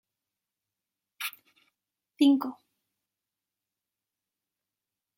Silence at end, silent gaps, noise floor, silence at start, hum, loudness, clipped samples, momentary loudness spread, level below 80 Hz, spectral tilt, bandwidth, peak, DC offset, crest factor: 2.65 s; none; -89 dBFS; 1.2 s; none; -28 LUFS; under 0.1%; 14 LU; -88 dBFS; -3 dB/octave; 16.5 kHz; -12 dBFS; under 0.1%; 22 dB